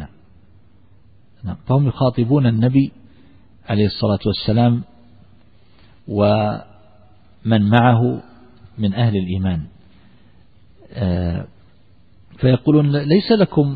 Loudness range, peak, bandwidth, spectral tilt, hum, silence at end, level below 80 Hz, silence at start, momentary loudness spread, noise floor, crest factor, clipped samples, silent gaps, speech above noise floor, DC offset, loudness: 5 LU; 0 dBFS; 4.9 kHz; -11 dB/octave; none; 0 s; -44 dBFS; 0 s; 16 LU; -53 dBFS; 18 dB; under 0.1%; none; 37 dB; 0.4%; -18 LUFS